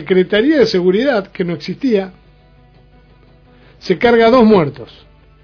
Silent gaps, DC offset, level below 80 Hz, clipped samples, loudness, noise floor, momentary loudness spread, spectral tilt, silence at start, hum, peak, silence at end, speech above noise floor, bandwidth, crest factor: none; under 0.1%; -46 dBFS; under 0.1%; -13 LUFS; -46 dBFS; 12 LU; -7 dB/octave; 0 s; 50 Hz at -50 dBFS; 0 dBFS; 0.6 s; 33 dB; 5.4 kHz; 14 dB